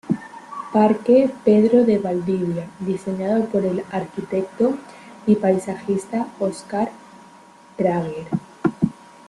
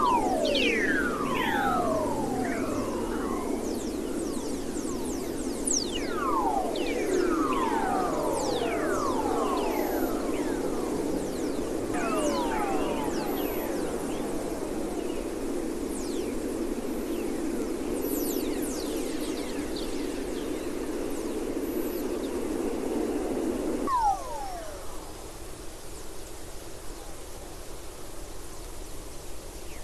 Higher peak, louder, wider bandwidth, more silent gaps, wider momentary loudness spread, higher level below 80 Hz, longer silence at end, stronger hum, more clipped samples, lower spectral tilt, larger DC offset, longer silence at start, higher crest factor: first, -4 dBFS vs -12 dBFS; first, -21 LUFS vs -30 LUFS; second, 11.5 kHz vs 16 kHz; neither; second, 12 LU vs 16 LU; second, -58 dBFS vs -46 dBFS; first, 0.35 s vs 0 s; neither; neither; first, -8 dB/octave vs -4 dB/octave; neither; about the same, 0.05 s vs 0 s; about the same, 18 dB vs 16 dB